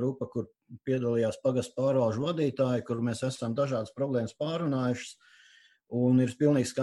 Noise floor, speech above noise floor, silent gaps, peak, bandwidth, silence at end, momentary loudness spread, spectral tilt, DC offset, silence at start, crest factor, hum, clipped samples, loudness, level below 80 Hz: -60 dBFS; 32 dB; none; -12 dBFS; 12 kHz; 0 s; 11 LU; -7 dB/octave; under 0.1%; 0 s; 16 dB; none; under 0.1%; -29 LUFS; -68 dBFS